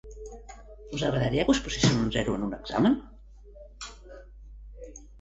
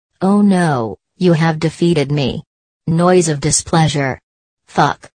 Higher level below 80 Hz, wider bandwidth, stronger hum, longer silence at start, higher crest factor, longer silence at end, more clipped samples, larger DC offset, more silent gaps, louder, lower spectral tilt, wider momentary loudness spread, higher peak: about the same, -44 dBFS vs -44 dBFS; second, 8.2 kHz vs 9.6 kHz; neither; second, 0.05 s vs 0.2 s; first, 22 dB vs 16 dB; about the same, 0 s vs 0.1 s; neither; neither; second, none vs 2.47-2.80 s, 4.23-4.57 s; second, -27 LUFS vs -15 LUFS; about the same, -5 dB/octave vs -5.5 dB/octave; first, 24 LU vs 10 LU; second, -8 dBFS vs 0 dBFS